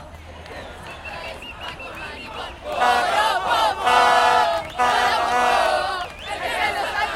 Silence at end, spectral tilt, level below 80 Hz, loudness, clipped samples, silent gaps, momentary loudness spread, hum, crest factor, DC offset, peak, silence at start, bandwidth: 0 s; -2 dB/octave; -46 dBFS; -19 LUFS; under 0.1%; none; 19 LU; none; 20 dB; under 0.1%; -2 dBFS; 0 s; 16.5 kHz